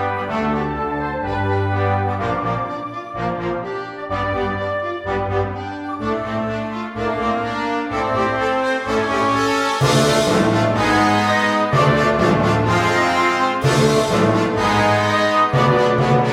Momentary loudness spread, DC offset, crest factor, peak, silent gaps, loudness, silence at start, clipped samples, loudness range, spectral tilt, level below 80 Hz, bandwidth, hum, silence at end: 9 LU; under 0.1%; 16 dB; -2 dBFS; none; -18 LUFS; 0 s; under 0.1%; 7 LU; -5.5 dB/octave; -42 dBFS; 16 kHz; none; 0 s